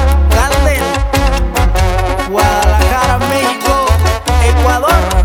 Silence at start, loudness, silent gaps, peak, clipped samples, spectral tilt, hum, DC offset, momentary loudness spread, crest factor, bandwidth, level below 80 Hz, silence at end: 0 s; -12 LUFS; none; 0 dBFS; under 0.1%; -5 dB/octave; none; under 0.1%; 3 LU; 10 dB; 18 kHz; -14 dBFS; 0 s